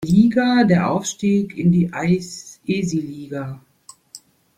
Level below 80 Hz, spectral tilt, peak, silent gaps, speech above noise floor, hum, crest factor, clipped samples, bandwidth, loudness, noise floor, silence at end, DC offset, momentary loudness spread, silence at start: -52 dBFS; -6.5 dB/octave; -4 dBFS; none; 28 dB; none; 16 dB; under 0.1%; 11.5 kHz; -19 LUFS; -46 dBFS; 0.4 s; under 0.1%; 17 LU; 0 s